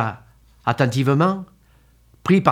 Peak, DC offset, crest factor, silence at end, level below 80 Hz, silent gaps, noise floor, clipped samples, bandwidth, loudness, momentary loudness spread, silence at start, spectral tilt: 0 dBFS; under 0.1%; 20 dB; 0 s; -56 dBFS; none; -54 dBFS; under 0.1%; 14.5 kHz; -20 LUFS; 13 LU; 0 s; -7 dB/octave